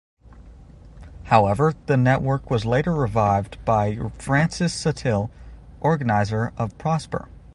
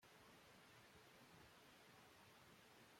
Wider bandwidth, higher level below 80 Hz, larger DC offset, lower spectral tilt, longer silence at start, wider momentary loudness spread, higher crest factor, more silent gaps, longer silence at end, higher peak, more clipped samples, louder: second, 11.5 kHz vs 16.5 kHz; first, -42 dBFS vs -88 dBFS; neither; first, -6.5 dB/octave vs -3 dB/octave; first, 0.3 s vs 0 s; first, 8 LU vs 1 LU; first, 20 dB vs 14 dB; neither; first, 0.15 s vs 0 s; first, -2 dBFS vs -54 dBFS; neither; first, -22 LUFS vs -67 LUFS